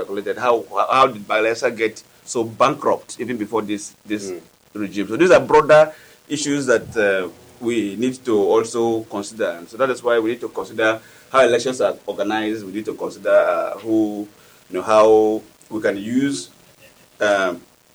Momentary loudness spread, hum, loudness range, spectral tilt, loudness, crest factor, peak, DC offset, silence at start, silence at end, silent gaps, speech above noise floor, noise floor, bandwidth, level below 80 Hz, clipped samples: 14 LU; none; 4 LU; -4.5 dB/octave; -19 LUFS; 16 dB; -4 dBFS; under 0.1%; 0 s; 0.35 s; none; 31 dB; -50 dBFS; over 20 kHz; -58 dBFS; under 0.1%